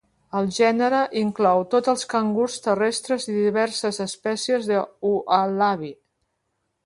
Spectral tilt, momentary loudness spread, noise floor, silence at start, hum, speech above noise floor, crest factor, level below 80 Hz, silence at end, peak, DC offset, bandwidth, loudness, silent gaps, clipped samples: -4.5 dB/octave; 7 LU; -75 dBFS; 0.35 s; none; 53 dB; 18 dB; -66 dBFS; 0.9 s; -4 dBFS; under 0.1%; 11.5 kHz; -22 LUFS; none; under 0.1%